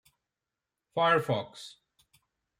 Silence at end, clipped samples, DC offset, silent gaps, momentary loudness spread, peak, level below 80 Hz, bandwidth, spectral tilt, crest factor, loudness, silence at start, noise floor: 0.9 s; under 0.1%; under 0.1%; none; 21 LU; -12 dBFS; -78 dBFS; 16 kHz; -5.5 dB/octave; 20 dB; -28 LUFS; 0.95 s; -89 dBFS